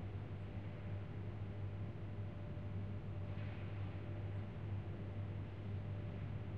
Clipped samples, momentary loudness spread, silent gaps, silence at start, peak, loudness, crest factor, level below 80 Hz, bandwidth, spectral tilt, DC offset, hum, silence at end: under 0.1%; 2 LU; none; 0 s; -34 dBFS; -47 LUFS; 10 dB; -58 dBFS; 4.8 kHz; -9.5 dB/octave; 0.2%; none; 0 s